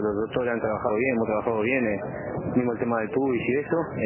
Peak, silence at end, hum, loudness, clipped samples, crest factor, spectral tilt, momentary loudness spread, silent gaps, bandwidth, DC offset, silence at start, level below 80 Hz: -10 dBFS; 0 s; none; -26 LUFS; under 0.1%; 16 dB; -11 dB/octave; 4 LU; none; 3.2 kHz; under 0.1%; 0 s; -52 dBFS